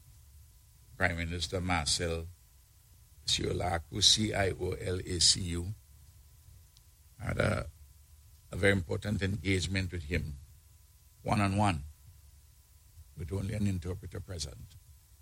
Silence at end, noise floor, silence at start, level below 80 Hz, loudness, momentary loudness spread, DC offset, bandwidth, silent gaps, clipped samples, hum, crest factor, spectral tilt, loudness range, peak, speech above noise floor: 0.3 s; -60 dBFS; 0.25 s; -48 dBFS; -31 LUFS; 18 LU; under 0.1%; 16.5 kHz; none; under 0.1%; none; 26 dB; -3.5 dB/octave; 7 LU; -8 dBFS; 29 dB